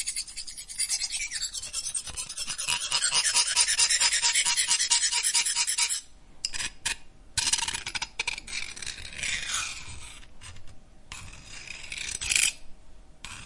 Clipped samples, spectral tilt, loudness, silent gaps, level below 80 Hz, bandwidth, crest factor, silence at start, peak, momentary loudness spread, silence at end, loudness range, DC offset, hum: under 0.1%; 2 dB/octave; -26 LUFS; none; -52 dBFS; 11.5 kHz; 24 dB; 0 s; -6 dBFS; 19 LU; 0 s; 12 LU; under 0.1%; none